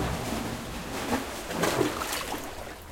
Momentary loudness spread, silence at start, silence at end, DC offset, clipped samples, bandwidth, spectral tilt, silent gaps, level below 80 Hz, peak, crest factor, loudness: 9 LU; 0 s; 0 s; under 0.1%; under 0.1%; 17 kHz; -4 dB/octave; none; -46 dBFS; -12 dBFS; 20 dB; -31 LUFS